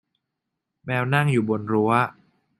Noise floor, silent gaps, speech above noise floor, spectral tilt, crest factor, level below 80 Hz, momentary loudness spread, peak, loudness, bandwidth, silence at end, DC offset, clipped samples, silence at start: -82 dBFS; none; 60 dB; -7.5 dB/octave; 20 dB; -62 dBFS; 8 LU; -4 dBFS; -22 LUFS; 12.5 kHz; 0.5 s; under 0.1%; under 0.1%; 0.85 s